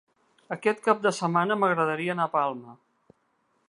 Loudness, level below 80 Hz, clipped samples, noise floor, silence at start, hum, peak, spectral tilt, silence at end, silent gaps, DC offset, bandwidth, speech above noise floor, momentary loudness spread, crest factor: -26 LUFS; -80 dBFS; under 0.1%; -71 dBFS; 0.5 s; none; -6 dBFS; -5.5 dB/octave; 0.95 s; none; under 0.1%; 11.5 kHz; 45 dB; 7 LU; 22 dB